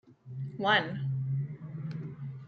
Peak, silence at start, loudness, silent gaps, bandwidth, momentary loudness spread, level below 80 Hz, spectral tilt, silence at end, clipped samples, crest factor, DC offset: -12 dBFS; 0.05 s; -32 LUFS; none; 6.6 kHz; 15 LU; -70 dBFS; -7 dB/octave; 0 s; under 0.1%; 22 dB; under 0.1%